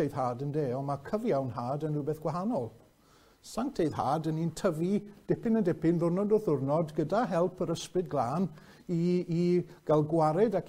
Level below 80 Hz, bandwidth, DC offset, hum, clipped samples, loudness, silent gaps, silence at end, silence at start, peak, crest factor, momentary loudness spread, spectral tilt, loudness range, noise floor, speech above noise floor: -60 dBFS; 15.5 kHz; under 0.1%; none; under 0.1%; -31 LUFS; none; 0 s; 0 s; -14 dBFS; 16 dB; 7 LU; -7.5 dB/octave; 4 LU; -62 dBFS; 32 dB